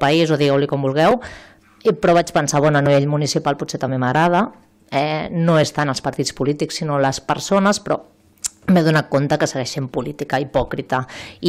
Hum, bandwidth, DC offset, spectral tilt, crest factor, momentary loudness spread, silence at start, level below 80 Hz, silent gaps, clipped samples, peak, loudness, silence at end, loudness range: none; 15 kHz; under 0.1%; -5.5 dB/octave; 10 dB; 9 LU; 0 s; -48 dBFS; none; under 0.1%; -8 dBFS; -18 LUFS; 0 s; 3 LU